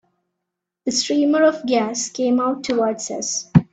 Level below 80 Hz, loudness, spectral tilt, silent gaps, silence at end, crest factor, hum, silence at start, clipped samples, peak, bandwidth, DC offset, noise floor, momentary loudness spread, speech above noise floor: -52 dBFS; -20 LUFS; -4.5 dB/octave; none; 0.1 s; 20 dB; none; 0.85 s; under 0.1%; 0 dBFS; 9.2 kHz; under 0.1%; -81 dBFS; 7 LU; 62 dB